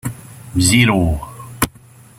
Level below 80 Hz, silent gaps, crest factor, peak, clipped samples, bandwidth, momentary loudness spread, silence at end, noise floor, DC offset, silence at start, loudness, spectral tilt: -34 dBFS; none; 18 dB; 0 dBFS; under 0.1%; 16.5 kHz; 19 LU; 0.5 s; -44 dBFS; under 0.1%; 0.05 s; -16 LUFS; -4 dB/octave